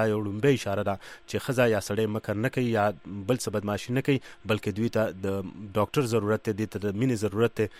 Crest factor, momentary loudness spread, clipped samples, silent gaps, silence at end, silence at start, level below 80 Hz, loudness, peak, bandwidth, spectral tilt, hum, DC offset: 16 dB; 7 LU; under 0.1%; none; 0 s; 0 s; -60 dBFS; -28 LUFS; -10 dBFS; 16 kHz; -6 dB/octave; none; under 0.1%